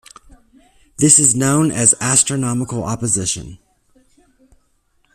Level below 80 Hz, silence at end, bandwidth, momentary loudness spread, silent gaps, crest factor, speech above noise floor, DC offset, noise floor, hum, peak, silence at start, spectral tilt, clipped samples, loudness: -48 dBFS; 1.6 s; 15 kHz; 12 LU; none; 18 dB; 45 dB; under 0.1%; -61 dBFS; none; 0 dBFS; 1 s; -3.5 dB/octave; under 0.1%; -14 LUFS